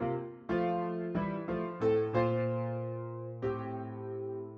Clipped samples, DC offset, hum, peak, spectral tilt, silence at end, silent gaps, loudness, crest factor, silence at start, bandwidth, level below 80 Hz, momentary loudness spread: under 0.1%; under 0.1%; none; -16 dBFS; -10 dB/octave; 0 s; none; -35 LUFS; 18 dB; 0 s; 6.2 kHz; -60 dBFS; 10 LU